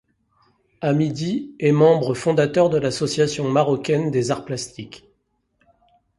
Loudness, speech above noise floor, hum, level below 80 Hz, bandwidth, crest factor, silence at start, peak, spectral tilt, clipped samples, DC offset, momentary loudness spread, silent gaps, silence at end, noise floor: -20 LUFS; 49 dB; none; -58 dBFS; 11.5 kHz; 18 dB; 0.8 s; -2 dBFS; -6 dB/octave; under 0.1%; under 0.1%; 12 LU; none; 1.2 s; -69 dBFS